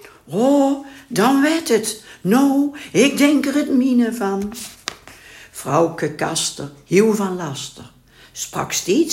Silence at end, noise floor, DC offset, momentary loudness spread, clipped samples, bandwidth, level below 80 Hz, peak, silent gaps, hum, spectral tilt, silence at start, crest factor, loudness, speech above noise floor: 0 s; -42 dBFS; under 0.1%; 14 LU; under 0.1%; 16.5 kHz; -56 dBFS; 0 dBFS; none; none; -4.5 dB/octave; 0.25 s; 18 dB; -18 LUFS; 24 dB